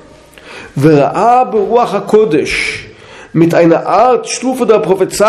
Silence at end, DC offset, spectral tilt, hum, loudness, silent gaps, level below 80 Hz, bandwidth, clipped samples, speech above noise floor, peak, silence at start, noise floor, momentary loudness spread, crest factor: 0 s; under 0.1%; -5.5 dB/octave; none; -10 LUFS; none; -44 dBFS; 14 kHz; 0.4%; 27 dB; 0 dBFS; 0.45 s; -37 dBFS; 8 LU; 10 dB